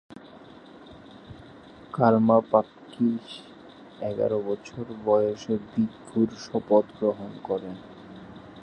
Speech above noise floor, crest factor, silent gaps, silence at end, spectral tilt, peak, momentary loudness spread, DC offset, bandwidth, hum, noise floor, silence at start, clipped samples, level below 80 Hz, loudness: 23 dB; 22 dB; none; 0 s; -8 dB/octave; -6 dBFS; 25 LU; under 0.1%; 9.2 kHz; none; -48 dBFS; 0.15 s; under 0.1%; -62 dBFS; -26 LUFS